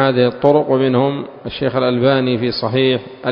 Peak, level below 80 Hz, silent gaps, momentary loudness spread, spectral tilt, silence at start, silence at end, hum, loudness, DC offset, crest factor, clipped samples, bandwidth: 0 dBFS; -50 dBFS; none; 7 LU; -9.5 dB/octave; 0 s; 0 s; none; -16 LUFS; under 0.1%; 16 dB; under 0.1%; 5.4 kHz